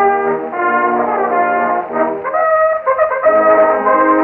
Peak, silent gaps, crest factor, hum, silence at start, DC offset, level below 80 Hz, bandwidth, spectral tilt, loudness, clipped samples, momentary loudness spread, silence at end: -2 dBFS; none; 12 dB; none; 0 s; under 0.1%; -54 dBFS; 3.3 kHz; -9.5 dB/octave; -13 LUFS; under 0.1%; 6 LU; 0 s